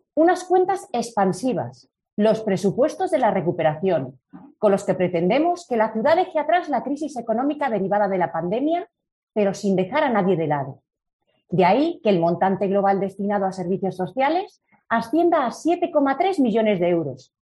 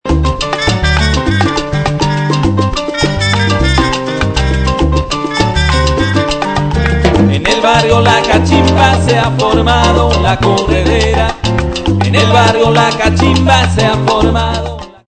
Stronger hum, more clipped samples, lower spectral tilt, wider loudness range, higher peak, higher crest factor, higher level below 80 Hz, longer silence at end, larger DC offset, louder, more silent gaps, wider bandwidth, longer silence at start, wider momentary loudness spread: neither; second, under 0.1% vs 0.6%; about the same, -6.5 dB/octave vs -5.5 dB/octave; about the same, 2 LU vs 3 LU; second, -6 dBFS vs 0 dBFS; first, 16 dB vs 10 dB; second, -66 dBFS vs -20 dBFS; first, 0.3 s vs 0.15 s; neither; second, -21 LUFS vs -11 LUFS; first, 2.13-2.17 s, 9.12-9.27 s, 11.13-11.19 s vs none; first, 12 kHz vs 10 kHz; about the same, 0.15 s vs 0.05 s; about the same, 6 LU vs 6 LU